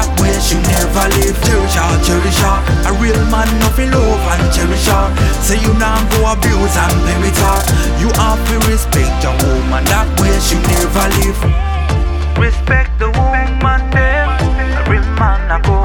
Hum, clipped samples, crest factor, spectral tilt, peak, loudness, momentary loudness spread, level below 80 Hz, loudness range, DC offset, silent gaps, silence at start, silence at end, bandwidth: none; under 0.1%; 12 dB; -4.5 dB/octave; 0 dBFS; -13 LUFS; 2 LU; -14 dBFS; 1 LU; under 0.1%; none; 0 s; 0 s; 19 kHz